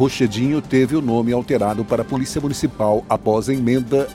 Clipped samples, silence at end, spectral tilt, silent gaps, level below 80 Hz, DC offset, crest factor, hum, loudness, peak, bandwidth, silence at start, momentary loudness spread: under 0.1%; 0 s; -6.5 dB/octave; none; -44 dBFS; under 0.1%; 14 dB; none; -19 LUFS; -4 dBFS; 16 kHz; 0 s; 4 LU